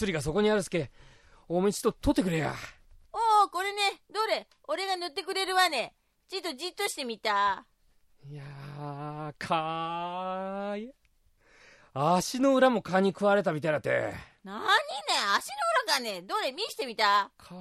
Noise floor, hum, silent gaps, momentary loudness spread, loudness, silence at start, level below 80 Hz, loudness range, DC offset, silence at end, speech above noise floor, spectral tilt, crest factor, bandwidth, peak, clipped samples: -65 dBFS; none; none; 15 LU; -29 LUFS; 0 s; -56 dBFS; 8 LU; under 0.1%; 0 s; 36 dB; -4 dB/octave; 20 dB; 15 kHz; -10 dBFS; under 0.1%